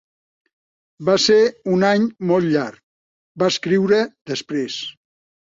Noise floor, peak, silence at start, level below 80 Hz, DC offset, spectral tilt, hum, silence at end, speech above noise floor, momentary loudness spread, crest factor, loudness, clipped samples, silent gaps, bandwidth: under -90 dBFS; -4 dBFS; 1 s; -64 dBFS; under 0.1%; -5 dB/octave; none; 0.5 s; over 72 dB; 12 LU; 16 dB; -19 LUFS; under 0.1%; 2.83-3.35 s, 4.21-4.25 s; 7.8 kHz